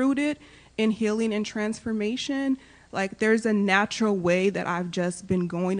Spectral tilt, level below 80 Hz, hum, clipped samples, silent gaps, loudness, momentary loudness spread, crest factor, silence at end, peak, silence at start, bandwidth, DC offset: -5.5 dB/octave; -60 dBFS; none; under 0.1%; none; -26 LUFS; 8 LU; 20 dB; 0 s; -6 dBFS; 0 s; 10 kHz; under 0.1%